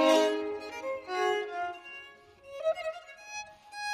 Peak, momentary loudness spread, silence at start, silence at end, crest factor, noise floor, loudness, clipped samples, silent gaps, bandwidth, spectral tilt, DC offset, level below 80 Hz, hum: -12 dBFS; 17 LU; 0 s; 0 s; 20 dB; -53 dBFS; -33 LUFS; under 0.1%; none; 15.5 kHz; -2 dB/octave; under 0.1%; -72 dBFS; none